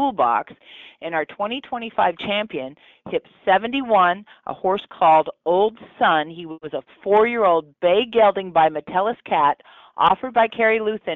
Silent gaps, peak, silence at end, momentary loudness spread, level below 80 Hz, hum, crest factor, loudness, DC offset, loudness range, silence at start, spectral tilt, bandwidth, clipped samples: none; -6 dBFS; 0 s; 14 LU; -60 dBFS; none; 14 dB; -20 LUFS; under 0.1%; 5 LU; 0 s; -2 dB/octave; 4.3 kHz; under 0.1%